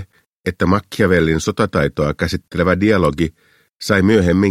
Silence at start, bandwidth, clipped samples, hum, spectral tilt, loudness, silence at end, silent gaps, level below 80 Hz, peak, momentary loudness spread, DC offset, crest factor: 0 s; 15.5 kHz; under 0.1%; none; -6.5 dB/octave; -16 LUFS; 0 s; 0.26-0.44 s, 3.76-3.80 s; -36 dBFS; 0 dBFS; 9 LU; under 0.1%; 16 dB